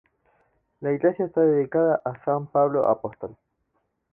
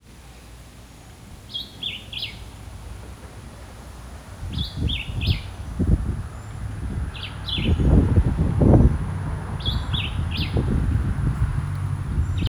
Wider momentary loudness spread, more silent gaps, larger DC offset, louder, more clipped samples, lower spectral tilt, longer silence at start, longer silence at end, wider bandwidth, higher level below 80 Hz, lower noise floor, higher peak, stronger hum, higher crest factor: second, 12 LU vs 22 LU; neither; neither; about the same, -23 LUFS vs -24 LUFS; neither; first, -12 dB/octave vs -7 dB/octave; first, 0.8 s vs 0.1 s; first, 0.8 s vs 0 s; second, 2.9 kHz vs 14.5 kHz; second, -66 dBFS vs -28 dBFS; first, -74 dBFS vs -44 dBFS; second, -8 dBFS vs -2 dBFS; neither; about the same, 16 dB vs 20 dB